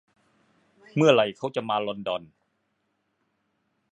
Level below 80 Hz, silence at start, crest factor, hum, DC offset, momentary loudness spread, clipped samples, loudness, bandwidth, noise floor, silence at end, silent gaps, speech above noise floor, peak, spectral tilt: -72 dBFS; 0.95 s; 24 dB; none; under 0.1%; 13 LU; under 0.1%; -25 LUFS; 9.2 kHz; -75 dBFS; 1.65 s; none; 51 dB; -6 dBFS; -5.5 dB/octave